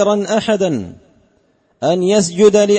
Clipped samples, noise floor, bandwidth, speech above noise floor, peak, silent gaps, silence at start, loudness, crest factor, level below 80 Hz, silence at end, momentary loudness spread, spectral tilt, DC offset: under 0.1%; -58 dBFS; 8.8 kHz; 45 dB; 0 dBFS; none; 0 s; -15 LUFS; 14 dB; -54 dBFS; 0 s; 11 LU; -5 dB/octave; under 0.1%